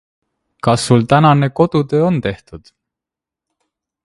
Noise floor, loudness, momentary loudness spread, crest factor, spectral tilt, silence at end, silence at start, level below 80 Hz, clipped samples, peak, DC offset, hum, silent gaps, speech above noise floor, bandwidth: -86 dBFS; -14 LUFS; 10 LU; 16 dB; -6.5 dB/octave; 1.45 s; 0.65 s; -46 dBFS; under 0.1%; 0 dBFS; under 0.1%; none; none; 73 dB; 11.5 kHz